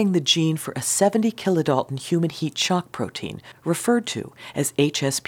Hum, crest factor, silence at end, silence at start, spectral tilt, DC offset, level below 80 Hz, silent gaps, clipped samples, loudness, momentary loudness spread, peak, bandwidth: none; 20 dB; 0.05 s; 0 s; -4 dB/octave; under 0.1%; -64 dBFS; none; under 0.1%; -22 LUFS; 11 LU; -4 dBFS; 19 kHz